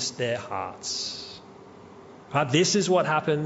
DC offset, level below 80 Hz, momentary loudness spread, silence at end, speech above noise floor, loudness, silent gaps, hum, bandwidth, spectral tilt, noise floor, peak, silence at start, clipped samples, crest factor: under 0.1%; -68 dBFS; 14 LU; 0 s; 22 dB; -25 LUFS; none; none; 8.2 kHz; -4 dB/octave; -47 dBFS; -8 dBFS; 0 s; under 0.1%; 18 dB